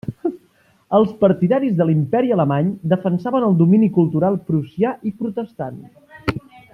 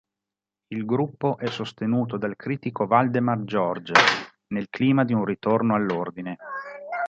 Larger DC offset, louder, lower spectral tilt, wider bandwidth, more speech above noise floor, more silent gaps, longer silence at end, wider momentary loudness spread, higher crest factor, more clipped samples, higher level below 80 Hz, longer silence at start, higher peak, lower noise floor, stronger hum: neither; first, -18 LUFS vs -24 LUFS; first, -10 dB/octave vs -6 dB/octave; second, 5.6 kHz vs 8.8 kHz; second, 40 dB vs 65 dB; neither; first, 0.35 s vs 0 s; about the same, 12 LU vs 13 LU; second, 16 dB vs 24 dB; neither; first, -54 dBFS vs -66 dBFS; second, 0.05 s vs 0.7 s; about the same, -2 dBFS vs -2 dBFS; second, -57 dBFS vs -88 dBFS; neither